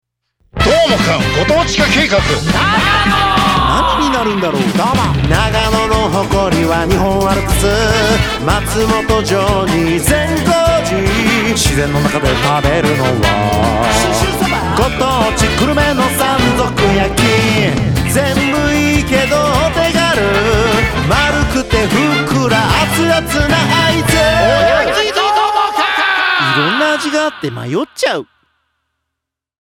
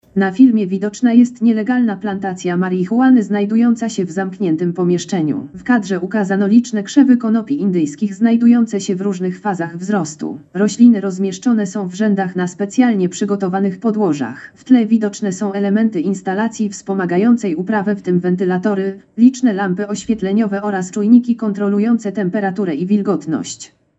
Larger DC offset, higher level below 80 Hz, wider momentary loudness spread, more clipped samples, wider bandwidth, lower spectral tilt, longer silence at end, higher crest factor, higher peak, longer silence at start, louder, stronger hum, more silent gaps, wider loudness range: neither; first, -26 dBFS vs -60 dBFS; second, 3 LU vs 9 LU; neither; first, over 20 kHz vs 8.2 kHz; second, -4.5 dB/octave vs -6.5 dB/octave; first, 1.4 s vs 0.35 s; about the same, 12 dB vs 14 dB; about the same, 0 dBFS vs 0 dBFS; first, 0.55 s vs 0.15 s; first, -12 LUFS vs -16 LUFS; neither; neither; about the same, 2 LU vs 2 LU